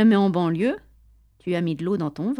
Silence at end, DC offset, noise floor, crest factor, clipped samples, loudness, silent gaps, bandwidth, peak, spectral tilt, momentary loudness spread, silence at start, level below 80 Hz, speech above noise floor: 0 s; under 0.1%; -55 dBFS; 14 dB; under 0.1%; -23 LUFS; none; 10.5 kHz; -8 dBFS; -8.5 dB/octave; 12 LU; 0 s; -58 dBFS; 34 dB